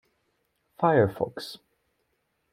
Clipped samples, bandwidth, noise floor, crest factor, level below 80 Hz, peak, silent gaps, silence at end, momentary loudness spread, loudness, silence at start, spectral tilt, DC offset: under 0.1%; 16 kHz; -75 dBFS; 22 dB; -66 dBFS; -8 dBFS; none; 0.95 s; 17 LU; -25 LUFS; 0.8 s; -7 dB/octave; under 0.1%